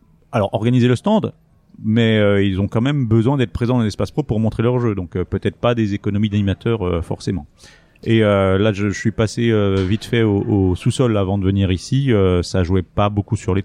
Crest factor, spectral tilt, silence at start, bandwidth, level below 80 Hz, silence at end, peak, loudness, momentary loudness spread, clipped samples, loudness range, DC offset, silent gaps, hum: 14 dB; -7 dB/octave; 0.3 s; 10.5 kHz; -40 dBFS; 0 s; -2 dBFS; -18 LUFS; 7 LU; under 0.1%; 2 LU; under 0.1%; none; none